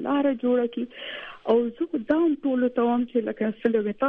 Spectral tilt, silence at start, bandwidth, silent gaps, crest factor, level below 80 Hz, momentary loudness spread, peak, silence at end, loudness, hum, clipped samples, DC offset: -8.5 dB/octave; 0 s; 4 kHz; none; 14 dB; -64 dBFS; 10 LU; -10 dBFS; 0 s; -25 LUFS; none; under 0.1%; under 0.1%